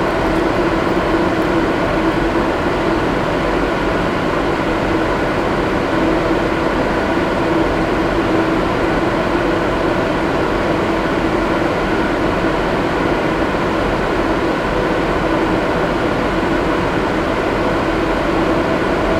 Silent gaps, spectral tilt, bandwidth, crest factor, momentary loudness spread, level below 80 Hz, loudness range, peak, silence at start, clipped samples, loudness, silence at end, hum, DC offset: none; -6.5 dB/octave; 14.5 kHz; 14 dB; 1 LU; -30 dBFS; 1 LU; -2 dBFS; 0 s; under 0.1%; -16 LUFS; 0 s; none; under 0.1%